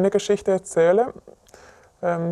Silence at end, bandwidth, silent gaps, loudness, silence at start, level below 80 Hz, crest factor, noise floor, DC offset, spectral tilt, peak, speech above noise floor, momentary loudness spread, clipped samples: 0 s; 12 kHz; none; -21 LUFS; 0 s; -58 dBFS; 16 dB; -50 dBFS; under 0.1%; -5.5 dB/octave; -6 dBFS; 29 dB; 9 LU; under 0.1%